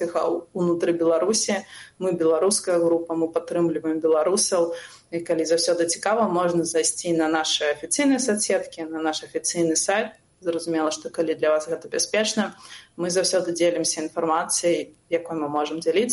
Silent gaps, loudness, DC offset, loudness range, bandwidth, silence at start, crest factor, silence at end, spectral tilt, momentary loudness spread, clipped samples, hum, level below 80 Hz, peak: none; -23 LUFS; under 0.1%; 3 LU; 11.5 kHz; 0 s; 14 dB; 0 s; -3 dB/octave; 8 LU; under 0.1%; none; -68 dBFS; -8 dBFS